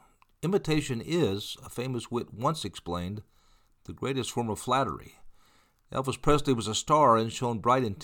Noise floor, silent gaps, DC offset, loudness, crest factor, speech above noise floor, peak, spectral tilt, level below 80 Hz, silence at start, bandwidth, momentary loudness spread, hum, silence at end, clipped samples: -63 dBFS; none; under 0.1%; -29 LUFS; 20 dB; 35 dB; -10 dBFS; -5 dB/octave; -50 dBFS; 0.4 s; 19 kHz; 13 LU; none; 0 s; under 0.1%